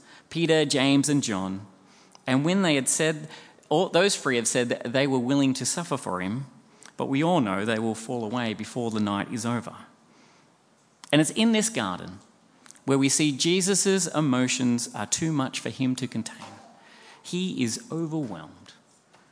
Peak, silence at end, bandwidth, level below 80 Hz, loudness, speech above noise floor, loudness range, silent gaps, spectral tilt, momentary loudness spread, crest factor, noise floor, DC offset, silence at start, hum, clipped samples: -4 dBFS; 0.6 s; 10.5 kHz; -72 dBFS; -25 LUFS; 36 dB; 6 LU; none; -4 dB/octave; 14 LU; 22 dB; -62 dBFS; under 0.1%; 0.1 s; none; under 0.1%